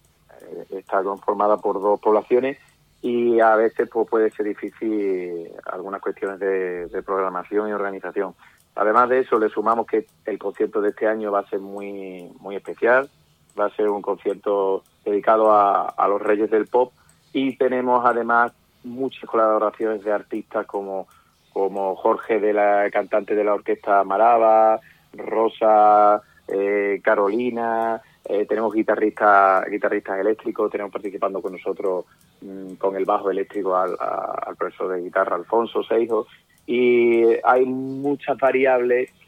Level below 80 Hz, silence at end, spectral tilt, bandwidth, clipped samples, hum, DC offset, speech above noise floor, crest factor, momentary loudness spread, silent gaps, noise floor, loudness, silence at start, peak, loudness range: -68 dBFS; 0.2 s; -7 dB/octave; 9.8 kHz; under 0.1%; none; under 0.1%; 27 dB; 18 dB; 13 LU; none; -47 dBFS; -21 LUFS; 0.45 s; -2 dBFS; 6 LU